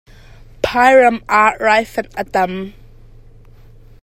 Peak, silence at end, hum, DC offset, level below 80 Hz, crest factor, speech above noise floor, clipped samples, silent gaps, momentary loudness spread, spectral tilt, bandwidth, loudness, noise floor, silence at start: 0 dBFS; 1.3 s; none; under 0.1%; -42 dBFS; 16 dB; 28 dB; under 0.1%; none; 14 LU; -4.5 dB/octave; 15.5 kHz; -14 LUFS; -41 dBFS; 0.65 s